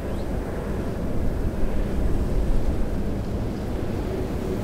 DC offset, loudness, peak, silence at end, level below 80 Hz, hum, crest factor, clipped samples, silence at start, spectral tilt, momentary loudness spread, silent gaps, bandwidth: under 0.1%; -28 LUFS; -10 dBFS; 0 s; -26 dBFS; none; 14 dB; under 0.1%; 0 s; -8 dB/octave; 3 LU; none; 15 kHz